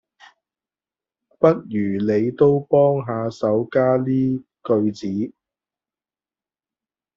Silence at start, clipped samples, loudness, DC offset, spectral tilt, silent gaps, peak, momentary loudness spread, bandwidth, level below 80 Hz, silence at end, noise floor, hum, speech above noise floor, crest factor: 1.4 s; under 0.1%; -20 LUFS; under 0.1%; -8 dB/octave; none; -2 dBFS; 9 LU; 7.4 kHz; -62 dBFS; 1.85 s; under -90 dBFS; none; over 71 dB; 20 dB